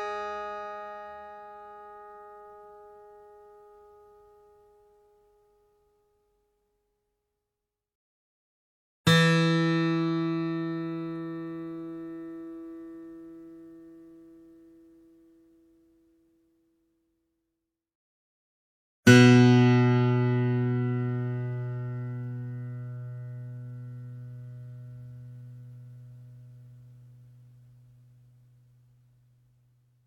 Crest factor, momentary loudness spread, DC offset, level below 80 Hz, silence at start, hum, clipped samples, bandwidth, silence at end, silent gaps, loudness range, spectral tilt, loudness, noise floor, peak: 26 dB; 27 LU; under 0.1%; -68 dBFS; 0 s; none; under 0.1%; 14.5 kHz; 3.4 s; 7.95-9.04 s, 17.95-19.03 s; 25 LU; -6.5 dB/octave; -25 LUFS; -87 dBFS; -4 dBFS